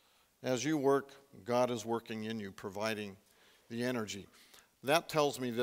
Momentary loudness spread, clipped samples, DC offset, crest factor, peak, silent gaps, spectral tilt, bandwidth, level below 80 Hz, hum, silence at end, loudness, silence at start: 14 LU; under 0.1%; under 0.1%; 24 dB; -12 dBFS; none; -4.5 dB/octave; 16 kHz; -78 dBFS; none; 0 s; -35 LUFS; 0.4 s